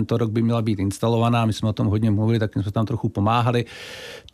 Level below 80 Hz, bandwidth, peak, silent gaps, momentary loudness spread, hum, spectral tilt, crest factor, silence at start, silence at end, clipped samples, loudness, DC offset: -54 dBFS; 13.5 kHz; -8 dBFS; none; 7 LU; none; -7.5 dB/octave; 14 dB; 0 s; 0.15 s; under 0.1%; -22 LUFS; under 0.1%